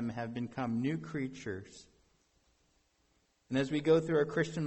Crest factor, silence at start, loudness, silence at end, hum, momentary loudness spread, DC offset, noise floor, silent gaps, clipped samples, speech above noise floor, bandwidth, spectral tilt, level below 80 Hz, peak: 20 dB; 0 s; -34 LUFS; 0 s; none; 14 LU; under 0.1%; -74 dBFS; none; under 0.1%; 41 dB; 8.4 kHz; -6.5 dB/octave; -68 dBFS; -16 dBFS